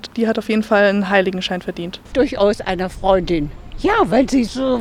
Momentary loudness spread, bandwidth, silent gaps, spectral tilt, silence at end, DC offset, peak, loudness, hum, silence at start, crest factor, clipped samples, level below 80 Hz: 9 LU; 14.5 kHz; none; -5.5 dB/octave; 0 s; under 0.1%; -2 dBFS; -17 LUFS; none; 0.05 s; 16 dB; under 0.1%; -36 dBFS